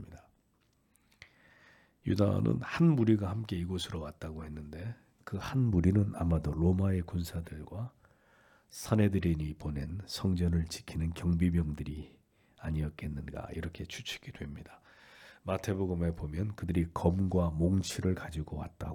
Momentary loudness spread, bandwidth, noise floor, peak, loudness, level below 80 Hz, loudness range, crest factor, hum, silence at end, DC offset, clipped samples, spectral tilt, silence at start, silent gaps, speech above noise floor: 15 LU; 18 kHz; -72 dBFS; -12 dBFS; -33 LUFS; -50 dBFS; 7 LU; 20 dB; none; 0 s; under 0.1%; under 0.1%; -7 dB/octave; 0 s; none; 40 dB